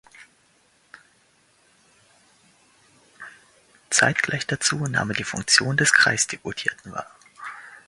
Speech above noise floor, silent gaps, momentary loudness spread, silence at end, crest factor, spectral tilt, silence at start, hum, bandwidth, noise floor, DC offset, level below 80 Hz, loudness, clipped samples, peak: 39 dB; none; 25 LU; 0.1 s; 26 dB; -2 dB/octave; 0.2 s; none; 11.5 kHz; -61 dBFS; under 0.1%; -60 dBFS; -21 LUFS; under 0.1%; 0 dBFS